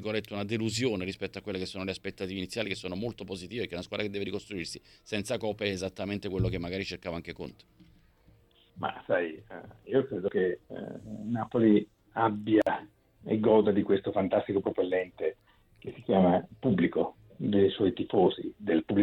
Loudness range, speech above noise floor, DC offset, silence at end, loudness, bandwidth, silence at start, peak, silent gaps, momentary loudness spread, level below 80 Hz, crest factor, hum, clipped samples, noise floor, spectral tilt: 8 LU; 32 dB; under 0.1%; 0 s; -30 LUFS; 14 kHz; 0 s; -10 dBFS; none; 14 LU; -58 dBFS; 20 dB; none; under 0.1%; -62 dBFS; -6.5 dB/octave